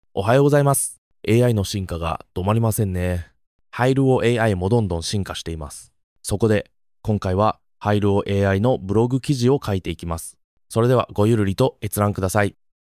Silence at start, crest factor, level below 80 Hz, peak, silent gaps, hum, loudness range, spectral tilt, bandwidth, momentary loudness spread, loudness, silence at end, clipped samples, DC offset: 0.15 s; 18 dB; -38 dBFS; -4 dBFS; 0.98-1.11 s, 3.47-3.59 s, 6.04-6.16 s, 10.44-10.57 s; none; 2 LU; -6 dB/octave; 16 kHz; 12 LU; -21 LUFS; 0.3 s; under 0.1%; under 0.1%